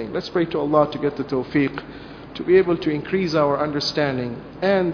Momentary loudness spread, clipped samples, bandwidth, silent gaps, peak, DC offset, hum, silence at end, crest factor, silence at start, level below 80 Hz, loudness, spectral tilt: 13 LU; under 0.1%; 5.4 kHz; none; -4 dBFS; under 0.1%; none; 0 s; 18 dB; 0 s; -50 dBFS; -21 LUFS; -6.5 dB/octave